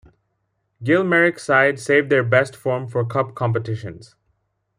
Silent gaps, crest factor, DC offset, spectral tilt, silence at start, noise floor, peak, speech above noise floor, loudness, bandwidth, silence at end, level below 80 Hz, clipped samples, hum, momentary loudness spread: none; 18 dB; under 0.1%; -6.5 dB/octave; 0.8 s; -72 dBFS; -2 dBFS; 53 dB; -19 LUFS; 14.5 kHz; 0.75 s; -60 dBFS; under 0.1%; none; 11 LU